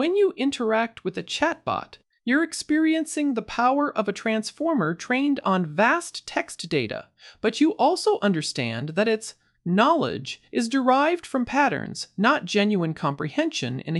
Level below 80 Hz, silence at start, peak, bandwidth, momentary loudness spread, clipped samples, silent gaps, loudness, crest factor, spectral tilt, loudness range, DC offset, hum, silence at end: -62 dBFS; 0 s; -4 dBFS; 12 kHz; 8 LU; under 0.1%; none; -24 LUFS; 20 dB; -5 dB/octave; 2 LU; under 0.1%; none; 0 s